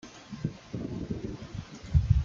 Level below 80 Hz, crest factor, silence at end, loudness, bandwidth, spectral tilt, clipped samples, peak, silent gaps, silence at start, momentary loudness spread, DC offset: -36 dBFS; 22 dB; 0 s; -34 LUFS; 7.4 kHz; -8 dB/octave; under 0.1%; -10 dBFS; none; 0.05 s; 13 LU; under 0.1%